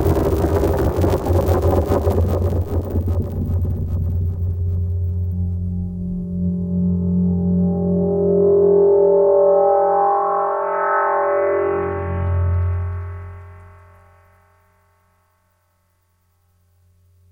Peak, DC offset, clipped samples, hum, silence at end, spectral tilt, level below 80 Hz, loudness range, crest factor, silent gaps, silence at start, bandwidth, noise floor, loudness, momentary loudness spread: -4 dBFS; under 0.1%; under 0.1%; none; 3.6 s; -9 dB/octave; -30 dBFS; 9 LU; 14 dB; none; 0 s; 17 kHz; -63 dBFS; -18 LUFS; 10 LU